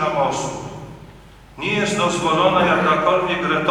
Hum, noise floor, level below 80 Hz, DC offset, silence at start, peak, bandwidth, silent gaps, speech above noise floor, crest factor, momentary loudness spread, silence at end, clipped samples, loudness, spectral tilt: none; -43 dBFS; -48 dBFS; under 0.1%; 0 s; -2 dBFS; 13 kHz; none; 25 dB; 16 dB; 16 LU; 0 s; under 0.1%; -18 LUFS; -4.5 dB/octave